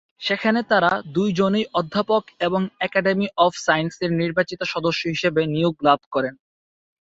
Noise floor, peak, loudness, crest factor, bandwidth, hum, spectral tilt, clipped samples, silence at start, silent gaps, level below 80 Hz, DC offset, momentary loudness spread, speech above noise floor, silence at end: under -90 dBFS; -2 dBFS; -21 LUFS; 18 dB; 8 kHz; none; -5.5 dB/octave; under 0.1%; 0.2 s; 6.06-6.11 s; -58 dBFS; under 0.1%; 5 LU; over 69 dB; 0.65 s